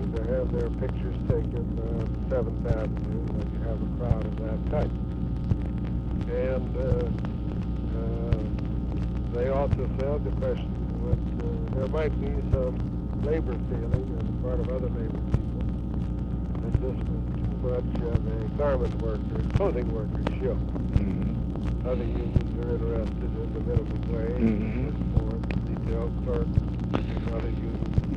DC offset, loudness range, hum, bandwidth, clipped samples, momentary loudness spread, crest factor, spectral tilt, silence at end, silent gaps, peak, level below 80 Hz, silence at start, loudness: under 0.1%; 1 LU; none; 5.8 kHz; under 0.1%; 4 LU; 18 dB; -10 dB/octave; 0 s; none; -8 dBFS; -32 dBFS; 0 s; -29 LUFS